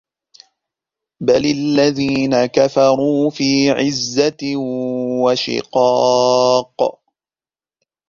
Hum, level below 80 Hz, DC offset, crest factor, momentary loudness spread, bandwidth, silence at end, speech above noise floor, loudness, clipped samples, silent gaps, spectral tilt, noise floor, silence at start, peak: none; -56 dBFS; under 0.1%; 16 dB; 8 LU; 7.4 kHz; 1.2 s; over 75 dB; -16 LUFS; under 0.1%; none; -4.5 dB/octave; under -90 dBFS; 1.2 s; 0 dBFS